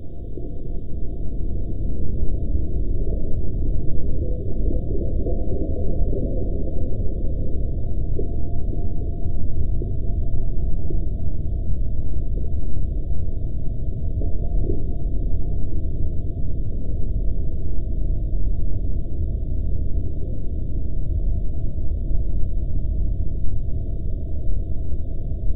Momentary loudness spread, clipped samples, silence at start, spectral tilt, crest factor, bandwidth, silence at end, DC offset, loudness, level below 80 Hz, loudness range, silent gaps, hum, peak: 3 LU; under 0.1%; 0 s; -14 dB/octave; 12 dB; 0.7 kHz; 0 s; under 0.1%; -28 LUFS; -24 dBFS; 2 LU; none; none; -6 dBFS